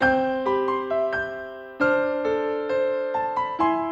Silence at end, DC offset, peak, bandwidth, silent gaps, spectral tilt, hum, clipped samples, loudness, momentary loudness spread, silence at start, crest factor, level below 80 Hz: 0 s; under 0.1%; -8 dBFS; 7.4 kHz; none; -6.5 dB/octave; none; under 0.1%; -24 LUFS; 5 LU; 0 s; 16 dB; -54 dBFS